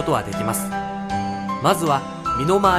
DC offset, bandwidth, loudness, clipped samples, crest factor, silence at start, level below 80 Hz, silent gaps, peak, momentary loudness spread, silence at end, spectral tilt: under 0.1%; 14 kHz; -22 LUFS; under 0.1%; 18 dB; 0 s; -44 dBFS; none; -4 dBFS; 7 LU; 0 s; -5 dB/octave